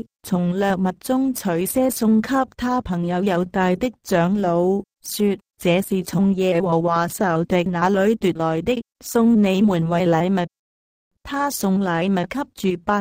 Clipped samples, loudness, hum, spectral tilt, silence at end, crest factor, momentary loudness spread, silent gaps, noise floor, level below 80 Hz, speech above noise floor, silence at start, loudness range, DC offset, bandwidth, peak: under 0.1%; -20 LUFS; none; -6 dB/octave; 0 s; 14 dB; 6 LU; 10.59-11.11 s; under -90 dBFS; -50 dBFS; over 70 dB; 0.25 s; 2 LU; under 0.1%; 16 kHz; -4 dBFS